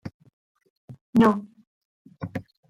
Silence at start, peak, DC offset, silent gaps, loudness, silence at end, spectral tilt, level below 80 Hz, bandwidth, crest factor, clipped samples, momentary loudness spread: 0.05 s; -6 dBFS; under 0.1%; 0.14-0.20 s, 0.33-0.55 s, 0.70-0.88 s, 1.01-1.13 s, 1.67-2.05 s; -23 LUFS; 0.3 s; -8 dB/octave; -58 dBFS; 11 kHz; 20 dB; under 0.1%; 20 LU